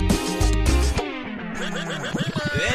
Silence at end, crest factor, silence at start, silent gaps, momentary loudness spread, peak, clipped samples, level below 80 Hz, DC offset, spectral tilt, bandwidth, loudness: 0 s; 18 dB; 0 s; none; 9 LU; -6 dBFS; under 0.1%; -26 dBFS; under 0.1%; -4.5 dB/octave; 15.5 kHz; -24 LUFS